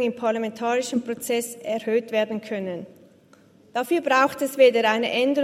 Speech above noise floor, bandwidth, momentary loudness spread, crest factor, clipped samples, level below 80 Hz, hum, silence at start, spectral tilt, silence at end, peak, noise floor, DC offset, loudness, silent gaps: 32 dB; 16 kHz; 12 LU; 18 dB; under 0.1%; -76 dBFS; none; 0 s; -3.5 dB/octave; 0 s; -4 dBFS; -54 dBFS; under 0.1%; -23 LUFS; none